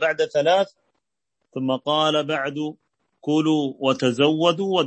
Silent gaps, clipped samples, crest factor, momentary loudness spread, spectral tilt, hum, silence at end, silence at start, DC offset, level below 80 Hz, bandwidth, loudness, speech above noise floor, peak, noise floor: none; under 0.1%; 18 dB; 10 LU; -5 dB/octave; none; 0 s; 0 s; under 0.1%; -70 dBFS; 8.6 kHz; -21 LUFS; 58 dB; -4 dBFS; -79 dBFS